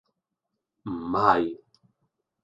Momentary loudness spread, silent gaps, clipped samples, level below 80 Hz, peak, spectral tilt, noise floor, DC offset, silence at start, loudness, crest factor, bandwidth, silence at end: 21 LU; none; under 0.1%; -60 dBFS; -4 dBFS; -7.5 dB/octave; -84 dBFS; under 0.1%; 0.85 s; -25 LUFS; 26 dB; 7.8 kHz; 0.85 s